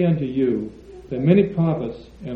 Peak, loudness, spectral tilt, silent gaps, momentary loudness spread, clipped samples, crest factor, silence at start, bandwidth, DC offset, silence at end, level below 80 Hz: -2 dBFS; -21 LUFS; -10.5 dB/octave; none; 15 LU; under 0.1%; 18 dB; 0 s; 4.7 kHz; under 0.1%; 0 s; -48 dBFS